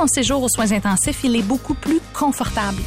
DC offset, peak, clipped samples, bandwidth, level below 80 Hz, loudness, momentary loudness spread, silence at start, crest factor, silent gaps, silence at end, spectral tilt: under 0.1%; -8 dBFS; under 0.1%; 16 kHz; -34 dBFS; -19 LUFS; 4 LU; 0 s; 10 dB; none; 0 s; -3.5 dB/octave